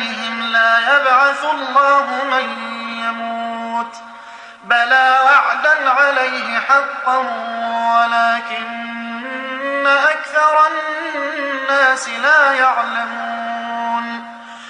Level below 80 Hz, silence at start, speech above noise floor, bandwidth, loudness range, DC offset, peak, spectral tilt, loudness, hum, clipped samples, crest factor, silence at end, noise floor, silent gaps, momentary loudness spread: -72 dBFS; 0 s; 21 dB; 10.5 kHz; 4 LU; under 0.1%; -2 dBFS; -1.5 dB/octave; -15 LUFS; none; under 0.1%; 16 dB; 0 s; -36 dBFS; none; 13 LU